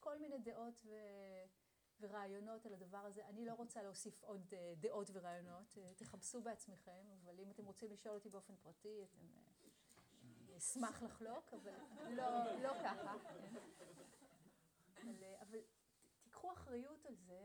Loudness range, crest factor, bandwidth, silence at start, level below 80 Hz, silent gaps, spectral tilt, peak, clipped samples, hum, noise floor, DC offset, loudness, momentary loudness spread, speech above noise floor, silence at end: 10 LU; 20 dB; over 20 kHz; 0 s; -84 dBFS; none; -4 dB/octave; -32 dBFS; under 0.1%; none; -77 dBFS; under 0.1%; -52 LUFS; 18 LU; 24 dB; 0 s